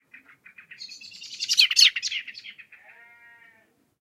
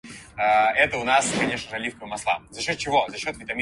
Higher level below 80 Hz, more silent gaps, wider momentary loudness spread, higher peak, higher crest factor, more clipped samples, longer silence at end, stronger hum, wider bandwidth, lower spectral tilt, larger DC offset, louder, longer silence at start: second, -86 dBFS vs -54 dBFS; neither; first, 26 LU vs 11 LU; about the same, -4 dBFS vs -6 dBFS; first, 24 dB vs 18 dB; neither; first, 1.5 s vs 0 s; neither; first, 16 kHz vs 11.5 kHz; second, 5 dB/octave vs -2.5 dB/octave; neither; first, -19 LUFS vs -23 LUFS; first, 0.8 s vs 0.05 s